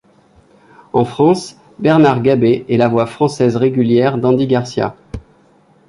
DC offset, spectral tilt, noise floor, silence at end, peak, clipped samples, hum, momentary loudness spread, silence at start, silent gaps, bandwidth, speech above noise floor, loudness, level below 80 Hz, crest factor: under 0.1%; -7.5 dB/octave; -50 dBFS; 0.7 s; 0 dBFS; under 0.1%; none; 10 LU; 0.95 s; none; 11 kHz; 37 dB; -14 LUFS; -46 dBFS; 14 dB